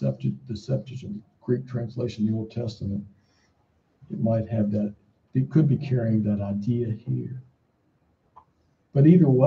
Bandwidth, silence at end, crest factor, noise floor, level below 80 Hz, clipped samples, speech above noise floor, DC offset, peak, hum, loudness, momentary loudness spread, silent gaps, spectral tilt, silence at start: 7.2 kHz; 0 s; 20 dB; -67 dBFS; -60 dBFS; under 0.1%; 44 dB; under 0.1%; -6 dBFS; none; -25 LUFS; 15 LU; none; -10 dB/octave; 0 s